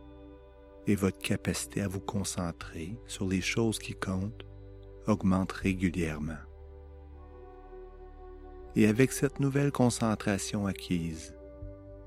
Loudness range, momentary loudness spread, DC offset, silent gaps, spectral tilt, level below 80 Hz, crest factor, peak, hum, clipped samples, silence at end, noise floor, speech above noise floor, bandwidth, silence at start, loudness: 5 LU; 23 LU; under 0.1%; none; -5.5 dB/octave; -50 dBFS; 24 dB; -8 dBFS; none; under 0.1%; 0 s; -52 dBFS; 22 dB; 16 kHz; 0 s; -31 LUFS